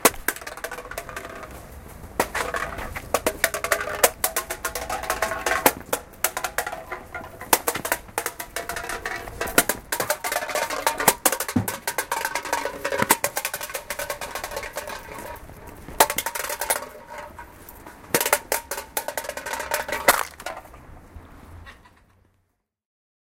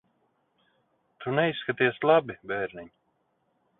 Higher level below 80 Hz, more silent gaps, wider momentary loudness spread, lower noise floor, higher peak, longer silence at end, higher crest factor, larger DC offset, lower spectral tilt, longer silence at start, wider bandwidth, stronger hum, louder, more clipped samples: first, -48 dBFS vs -70 dBFS; neither; first, 20 LU vs 14 LU; about the same, -72 dBFS vs -73 dBFS; first, 0 dBFS vs -8 dBFS; first, 1.45 s vs 0.9 s; first, 28 dB vs 22 dB; neither; second, -1.5 dB/octave vs -9.5 dB/octave; second, 0 s vs 1.2 s; first, 17 kHz vs 4.1 kHz; neither; about the same, -25 LUFS vs -26 LUFS; neither